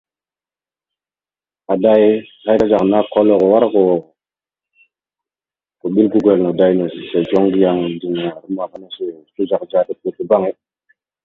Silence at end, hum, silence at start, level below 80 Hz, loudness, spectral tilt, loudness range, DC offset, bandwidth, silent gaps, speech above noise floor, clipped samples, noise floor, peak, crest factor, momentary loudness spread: 0.7 s; none; 1.7 s; -56 dBFS; -15 LUFS; -9 dB/octave; 5 LU; under 0.1%; 7 kHz; none; over 75 dB; under 0.1%; under -90 dBFS; 0 dBFS; 16 dB; 12 LU